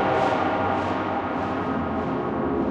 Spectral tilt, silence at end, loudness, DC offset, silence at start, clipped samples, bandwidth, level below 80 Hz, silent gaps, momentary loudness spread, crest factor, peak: -7.5 dB/octave; 0 s; -25 LUFS; under 0.1%; 0 s; under 0.1%; 9 kHz; -48 dBFS; none; 4 LU; 14 dB; -10 dBFS